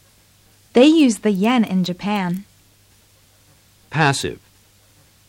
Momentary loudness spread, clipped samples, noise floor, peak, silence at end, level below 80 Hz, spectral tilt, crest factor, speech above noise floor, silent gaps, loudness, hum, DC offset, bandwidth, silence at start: 15 LU; under 0.1%; -54 dBFS; -2 dBFS; 0.95 s; -56 dBFS; -5.5 dB/octave; 18 dB; 37 dB; none; -18 LUFS; none; under 0.1%; 16.5 kHz; 0.75 s